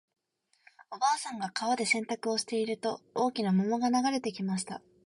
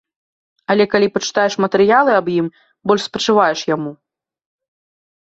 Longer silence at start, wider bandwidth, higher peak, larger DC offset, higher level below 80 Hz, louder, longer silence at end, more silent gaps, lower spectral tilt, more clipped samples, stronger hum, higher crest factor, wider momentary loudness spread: first, 0.9 s vs 0.7 s; first, 11.5 kHz vs 8 kHz; second, -14 dBFS vs -2 dBFS; neither; second, -76 dBFS vs -60 dBFS; second, -31 LUFS vs -16 LUFS; second, 0.25 s vs 1.35 s; neither; about the same, -4.5 dB/octave vs -4.5 dB/octave; neither; neither; about the same, 16 dB vs 16 dB; second, 7 LU vs 12 LU